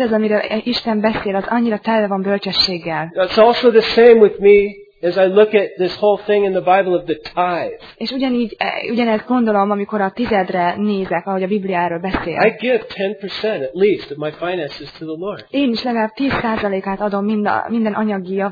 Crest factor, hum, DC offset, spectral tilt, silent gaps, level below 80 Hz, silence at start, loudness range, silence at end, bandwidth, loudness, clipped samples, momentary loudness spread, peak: 16 dB; none; under 0.1%; -7 dB/octave; none; -48 dBFS; 0 s; 7 LU; 0 s; 5 kHz; -16 LUFS; under 0.1%; 11 LU; 0 dBFS